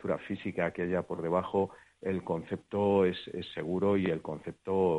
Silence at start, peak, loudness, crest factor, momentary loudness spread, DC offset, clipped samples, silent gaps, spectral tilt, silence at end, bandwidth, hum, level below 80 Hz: 0.05 s; -14 dBFS; -32 LUFS; 16 dB; 10 LU; under 0.1%; under 0.1%; none; -8 dB/octave; 0 s; 10.5 kHz; none; -64 dBFS